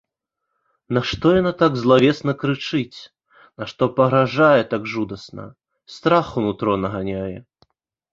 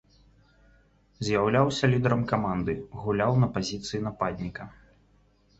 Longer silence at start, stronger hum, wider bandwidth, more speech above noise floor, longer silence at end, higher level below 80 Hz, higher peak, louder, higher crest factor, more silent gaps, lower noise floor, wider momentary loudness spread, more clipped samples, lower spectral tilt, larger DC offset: second, 0.9 s vs 1.2 s; neither; about the same, 7.6 kHz vs 8 kHz; first, 61 dB vs 36 dB; second, 0.7 s vs 0.9 s; about the same, -50 dBFS vs -52 dBFS; first, -2 dBFS vs -8 dBFS; first, -19 LUFS vs -27 LUFS; about the same, 18 dB vs 20 dB; neither; first, -80 dBFS vs -63 dBFS; first, 18 LU vs 12 LU; neither; about the same, -7 dB/octave vs -6.5 dB/octave; neither